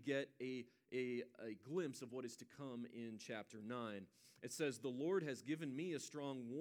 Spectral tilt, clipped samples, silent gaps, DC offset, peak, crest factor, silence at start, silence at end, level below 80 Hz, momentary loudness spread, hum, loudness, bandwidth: -5 dB/octave; under 0.1%; none; under 0.1%; -28 dBFS; 18 dB; 0 s; 0 s; under -90 dBFS; 10 LU; none; -47 LUFS; 20 kHz